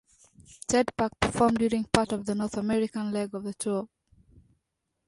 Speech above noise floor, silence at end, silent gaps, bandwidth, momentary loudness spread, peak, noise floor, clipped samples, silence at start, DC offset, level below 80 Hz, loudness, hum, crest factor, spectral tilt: 53 dB; 1.2 s; none; 11.5 kHz; 9 LU; -2 dBFS; -80 dBFS; under 0.1%; 0.4 s; under 0.1%; -52 dBFS; -28 LUFS; none; 26 dB; -5 dB/octave